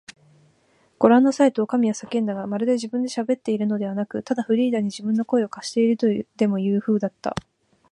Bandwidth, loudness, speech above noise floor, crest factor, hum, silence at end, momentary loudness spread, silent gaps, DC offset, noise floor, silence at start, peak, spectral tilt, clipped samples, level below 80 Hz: 11 kHz; -22 LUFS; 40 dB; 20 dB; none; 0.5 s; 9 LU; none; under 0.1%; -61 dBFS; 0.1 s; -2 dBFS; -6.5 dB/octave; under 0.1%; -62 dBFS